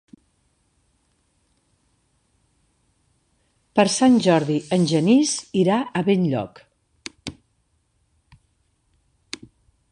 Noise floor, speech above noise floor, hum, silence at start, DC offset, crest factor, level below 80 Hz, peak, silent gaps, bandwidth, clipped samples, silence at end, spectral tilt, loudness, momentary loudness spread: -67 dBFS; 49 dB; none; 3.75 s; under 0.1%; 22 dB; -62 dBFS; -2 dBFS; none; 11 kHz; under 0.1%; 2.6 s; -5 dB/octave; -19 LUFS; 21 LU